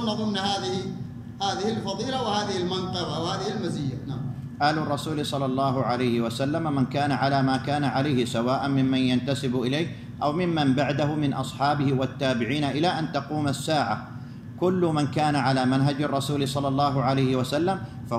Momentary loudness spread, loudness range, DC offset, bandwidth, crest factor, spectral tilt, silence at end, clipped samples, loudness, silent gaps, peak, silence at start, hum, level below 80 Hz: 6 LU; 3 LU; under 0.1%; 13.5 kHz; 14 dB; -6 dB/octave; 0 s; under 0.1%; -25 LUFS; none; -10 dBFS; 0 s; none; -56 dBFS